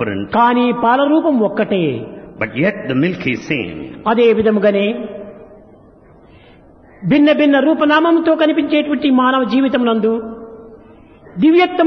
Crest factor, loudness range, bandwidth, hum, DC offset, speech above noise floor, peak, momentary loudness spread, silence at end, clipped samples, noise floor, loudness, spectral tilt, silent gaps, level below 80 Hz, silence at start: 14 dB; 5 LU; 6.4 kHz; none; under 0.1%; 31 dB; -2 dBFS; 14 LU; 0 s; under 0.1%; -44 dBFS; -14 LUFS; -7.5 dB/octave; none; -52 dBFS; 0 s